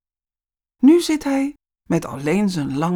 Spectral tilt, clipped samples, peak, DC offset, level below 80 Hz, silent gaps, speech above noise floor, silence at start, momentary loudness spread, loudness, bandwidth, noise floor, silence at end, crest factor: -6 dB/octave; under 0.1%; -4 dBFS; under 0.1%; -54 dBFS; none; over 72 dB; 0.8 s; 9 LU; -19 LUFS; 17 kHz; under -90 dBFS; 0 s; 16 dB